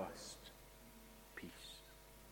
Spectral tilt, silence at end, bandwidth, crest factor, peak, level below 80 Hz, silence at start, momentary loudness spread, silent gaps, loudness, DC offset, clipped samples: -3 dB/octave; 0 s; 17.5 kHz; 24 dB; -32 dBFS; -66 dBFS; 0 s; 8 LU; none; -55 LUFS; under 0.1%; under 0.1%